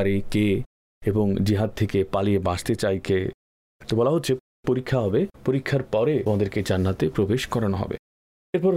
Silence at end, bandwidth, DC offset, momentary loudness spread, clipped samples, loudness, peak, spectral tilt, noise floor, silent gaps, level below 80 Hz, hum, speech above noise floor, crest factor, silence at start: 0 s; 16 kHz; under 0.1%; 6 LU; under 0.1%; -24 LUFS; -12 dBFS; -7 dB/octave; under -90 dBFS; 0.66-1.01 s, 3.34-3.80 s, 4.40-4.63 s, 7.99-8.53 s; -48 dBFS; none; over 67 dB; 12 dB; 0 s